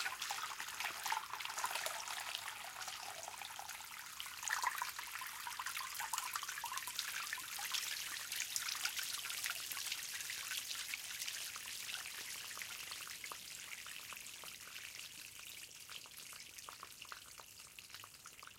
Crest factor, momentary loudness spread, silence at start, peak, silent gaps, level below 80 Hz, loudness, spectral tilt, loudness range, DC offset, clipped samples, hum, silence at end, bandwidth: 28 dB; 11 LU; 0 s; -18 dBFS; none; -80 dBFS; -43 LUFS; 2 dB/octave; 9 LU; under 0.1%; under 0.1%; none; 0 s; 17 kHz